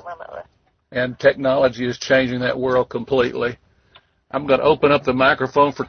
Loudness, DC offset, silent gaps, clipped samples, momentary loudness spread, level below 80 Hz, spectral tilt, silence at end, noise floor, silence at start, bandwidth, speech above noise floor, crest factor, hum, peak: -19 LUFS; under 0.1%; none; under 0.1%; 13 LU; -50 dBFS; -5.5 dB/octave; 0 s; -58 dBFS; 0.05 s; 6.6 kHz; 40 dB; 16 dB; none; -2 dBFS